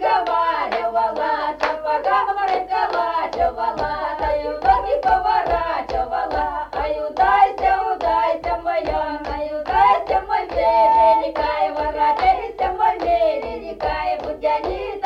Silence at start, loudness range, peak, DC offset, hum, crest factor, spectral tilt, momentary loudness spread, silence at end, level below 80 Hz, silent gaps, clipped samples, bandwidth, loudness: 0 s; 3 LU; -4 dBFS; under 0.1%; none; 16 dB; -5.5 dB/octave; 8 LU; 0 s; -40 dBFS; none; under 0.1%; 7.8 kHz; -20 LUFS